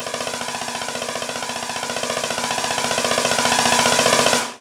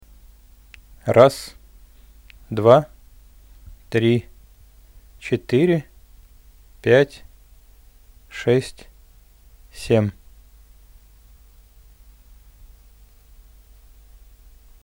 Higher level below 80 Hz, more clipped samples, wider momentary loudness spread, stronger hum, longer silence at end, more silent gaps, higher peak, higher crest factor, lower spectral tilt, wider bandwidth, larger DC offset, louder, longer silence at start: second, -56 dBFS vs -48 dBFS; neither; second, 10 LU vs 22 LU; neither; second, 0.05 s vs 4.7 s; neither; about the same, -2 dBFS vs 0 dBFS; second, 18 dB vs 24 dB; second, -1.5 dB/octave vs -7 dB/octave; about the same, 18.5 kHz vs 19 kHz; neither; about the same, -19 LUFS vs -19 LUFS; second, 0 s vs 1.05 s